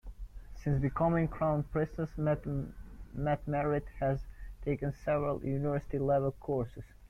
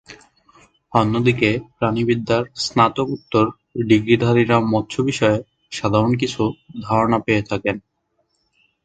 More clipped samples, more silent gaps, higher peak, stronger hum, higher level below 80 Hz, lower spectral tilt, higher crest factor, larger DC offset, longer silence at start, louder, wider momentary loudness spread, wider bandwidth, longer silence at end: neither; neither; second, -18 dBFS vs 0 dBFS; neither; about the same, -48 dBFS vs -48 dBFS; first, -10 dB/octave vs -6 dB/octave; about the same, 16 dB vs 18 dB; neither; about the same, 0.05 s vs 0.1 s; second, -34 LUFS vs -19 LUFS; first, 13 LU vs 9 LU; second, 6.6 kHz vs 9.2 kHz; second, 0 s vs 1.05 s